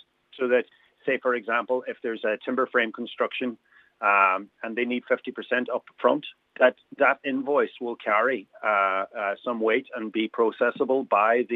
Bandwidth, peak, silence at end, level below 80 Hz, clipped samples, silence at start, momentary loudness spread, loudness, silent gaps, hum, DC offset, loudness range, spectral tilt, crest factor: 4.5 kHz; -4 dBFS; 0 s; -86 dBFS; under 0.1%; 0.35 s; 8 LU; -25 LUFS; none; none; under 0.1%; 2 LU; -6.5 dB/octave; 20 dB